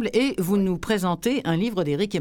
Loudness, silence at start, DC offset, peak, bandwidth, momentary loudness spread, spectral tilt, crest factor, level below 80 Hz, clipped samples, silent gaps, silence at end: -24 LUFS; 0 s; under 0.1%; -8 dBFS; 18 kHz; 2 LU; -6 dB/octave; 14 dB; -48 dBFS; under 0.1%; none; 0 s